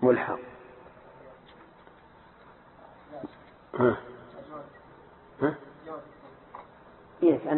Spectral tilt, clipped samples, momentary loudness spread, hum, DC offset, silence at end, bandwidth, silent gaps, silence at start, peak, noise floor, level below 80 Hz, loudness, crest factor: -11 dB/octave; under 0.1%; 27 LU; none; under 0.1%; 0 s; 4.2 kHz; none; 0 s; -10 dBFS; -55 dBFS; -64 dBFS; -30 LUFS; 22 dB